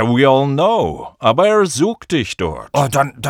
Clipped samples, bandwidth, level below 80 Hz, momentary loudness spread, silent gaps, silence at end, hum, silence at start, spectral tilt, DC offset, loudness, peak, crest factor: under 0.1%; 18.5 kHz; -44 dBFS; 8 LU; none; 0 s; none; 0 s; -5.5 dB/octave; under 0.1%; -15 LUFS; 0 dBFS; 14 dB